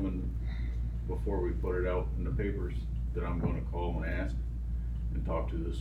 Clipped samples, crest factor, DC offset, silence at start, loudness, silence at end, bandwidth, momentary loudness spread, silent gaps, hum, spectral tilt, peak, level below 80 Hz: under 0.1%; 14 dB; under 0.1%; 0 s; -35 LUFS; 0 s; 4.4 kHz; 4 LU; none; none; -9 dB/octave; -18 dBFS; -34 dBFS